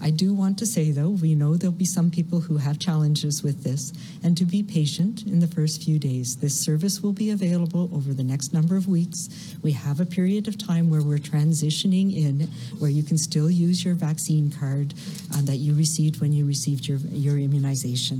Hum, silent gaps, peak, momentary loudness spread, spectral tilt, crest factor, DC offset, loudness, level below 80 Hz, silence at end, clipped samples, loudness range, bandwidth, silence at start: none; none; -10 dBFS; 5 LU; -6 dB/octave; 12 dB; under 0.1%; -23 LUFS; -68 dBFS; 0 s; under 0.1%; 2 LU; 15 kHz; 0 s